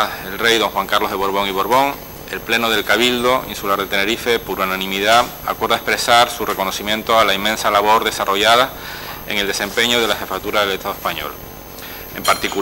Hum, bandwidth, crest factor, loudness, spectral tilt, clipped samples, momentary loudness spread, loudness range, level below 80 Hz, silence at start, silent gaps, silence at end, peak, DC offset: none; over 20 kHz; 18 dB; -16 LUFS; -2.5 dB/octave; under 0.1%; 14 LU; 4 LU; -44 dBFS; 0 s; none; 0 s; 0 dBFS; under 0.1%